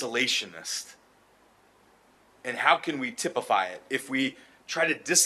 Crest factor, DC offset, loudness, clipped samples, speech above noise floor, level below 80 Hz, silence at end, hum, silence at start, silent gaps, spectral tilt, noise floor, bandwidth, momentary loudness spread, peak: 24 dB; under 0.1%; -28 LUFS; under 0.1%; 33 dB; -78 dBFS; 0 s; none; 0 s; none; -1 dB/octave; -61 dBFS; 13 kHz; 12 LU; -6 dBFS